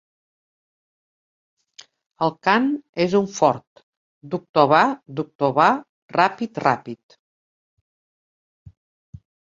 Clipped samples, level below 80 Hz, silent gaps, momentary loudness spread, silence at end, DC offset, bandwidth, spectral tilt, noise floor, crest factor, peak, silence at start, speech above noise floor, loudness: under 0.1%; -62 dBFS; 2.89-2.93 s, 3.67-3.76 s, 3.83-4.21 s, 4.49-4.54 s, 5.35-5.39 s, 5.89-6.09 s; 14 LU; 2.65 s; under 0.1%; 7.8 kHz; -5.5 dB/octave; -50 dBFS; 22 dB; -2 dBFS; 2.2 s; 30 dB; -20 LUFS